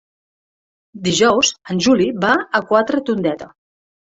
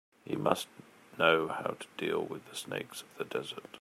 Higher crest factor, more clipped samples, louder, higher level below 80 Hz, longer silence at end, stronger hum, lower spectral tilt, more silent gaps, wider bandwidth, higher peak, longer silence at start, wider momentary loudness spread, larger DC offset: second, 16 dB vs 24 dB; neither; first, -16 LUFS vs -34 LUFS; first, -56 dBFS vs -78 dBFS; first, 0.7 s vs 0 s; neither; about the same, -3.5 dB/octave vs -4 dB/octave; neither; second, 8 kHz vs 16 kHz; first, -2 dBFS vs -10 dBFS; first, 0.95 s vs 0.25 s; second, 8 LU vs 15 LU; neither